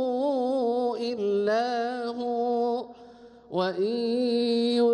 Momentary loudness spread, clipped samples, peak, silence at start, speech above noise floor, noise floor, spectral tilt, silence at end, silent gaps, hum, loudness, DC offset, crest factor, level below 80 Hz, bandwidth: 6 LU; under 0.1%; -14 dBFS; 0 s; 25 dB; -49 dBFS; -6 dB/octave; 0 s; none; none; -27 LUFS; under 0.1%; 12 dB; -72 dBFS; 10.5 kHz